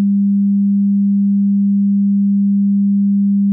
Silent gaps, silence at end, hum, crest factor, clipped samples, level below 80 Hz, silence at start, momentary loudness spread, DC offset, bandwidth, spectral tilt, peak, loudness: none; 0 s; none; 4 dB; under 0.1%; -72 dBFS; 0 s; 0 LU; under 0.1%; 0.3 kHz; -17 dB/octave; -10 dBFS; -14 LUFS